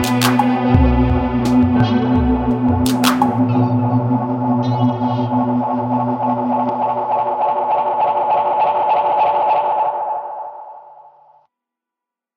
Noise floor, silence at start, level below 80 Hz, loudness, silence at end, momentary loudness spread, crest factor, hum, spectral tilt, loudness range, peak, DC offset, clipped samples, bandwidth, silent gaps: -85 dBFS; 0 s; -30 dBFS; -16 LUFS; 1.45 s; 4 LU; 16 dB; none; -6.5 dB/octave; 3 LU; 0 dBFS; under 0.1%; under 0.1%; 16 kHz; none